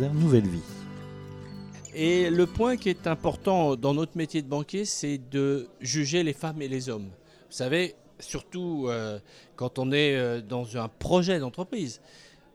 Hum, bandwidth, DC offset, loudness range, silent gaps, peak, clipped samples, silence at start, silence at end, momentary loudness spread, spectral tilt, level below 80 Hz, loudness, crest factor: none; 13.5 kHz; under 0.1%; 4 LU; none; -8 dBFS; under 0.1%; 0 s; 0.35 s; 18 LU; -5.5 dB/octave; -54 dBFS; -28 LUFS; 20 dB